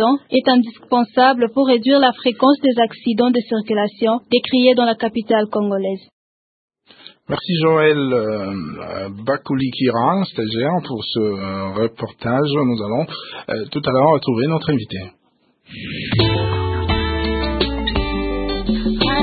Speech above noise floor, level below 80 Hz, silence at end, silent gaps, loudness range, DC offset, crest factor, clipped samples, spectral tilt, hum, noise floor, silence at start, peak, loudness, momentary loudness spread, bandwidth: 43 dB; -34 dBFS; 0 s; 6.13-6.68 s; 5 LU; under 0.1%; 16 dB; under 0.1%; -11.5 dB/octave; none; -60 dBFS; 0 s; -2 dBFS; -18 LUFS; 12 LU; 4.8 kHz